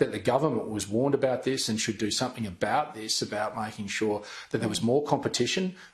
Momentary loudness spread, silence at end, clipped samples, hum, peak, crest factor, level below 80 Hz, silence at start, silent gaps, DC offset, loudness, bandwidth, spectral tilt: 6 LU; 0.05 s; under 0.1%; none; -8 dBFS; 20 dB; -64 dBFS; 0 s; none; under 0.1%; -28 LUFS; 13 kHz; -4 dB/octave